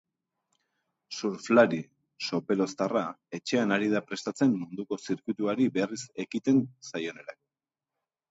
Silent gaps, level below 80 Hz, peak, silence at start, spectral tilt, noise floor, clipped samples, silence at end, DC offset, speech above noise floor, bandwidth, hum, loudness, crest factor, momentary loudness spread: none; -74 dBFS; -8 dBFS; 1.1 s; -5.5 dB/octave; under -90 dBFS; under 0.1%; 1 s; under 0.1%; over 62 dB; 8 kHz; none; -29 LUFS; 22 dB; 12 LU